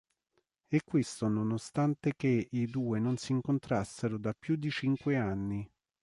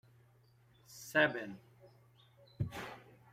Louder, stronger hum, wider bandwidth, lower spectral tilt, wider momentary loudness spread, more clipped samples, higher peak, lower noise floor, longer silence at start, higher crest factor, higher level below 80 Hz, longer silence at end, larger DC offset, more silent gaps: first, -33 LUFS vs -36 LUFS; neither; second, 11.5 kHz vs 16 kHz; first, -7 dB/octave vs -5 dB/octave; second, 5 LU vs 24 LU; neither; about the same, -16 dBFS vs -16 dBFS; first, -79 dBFS vs -67 dBFS; second, 0.7 s vs 0.9 s; second, 16 dB vs 24 dB; about the same, -62 dBFS vs -66 dBFS; about the same, 0.35 s vs 0.3 s; neither; neither